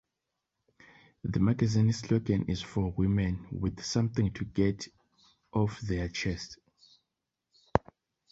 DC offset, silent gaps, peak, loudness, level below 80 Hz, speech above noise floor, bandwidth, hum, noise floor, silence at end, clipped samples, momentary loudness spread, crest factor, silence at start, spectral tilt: under 0.1%; none; -4 dBFS; -31 LUFS; -48 dBFS; 57 dB; 8 kHz; none; -86 dBFS; 0.55 s; under 0.1%; 8 LU; 28 dB; 1.25 s; -6.5 dB/octave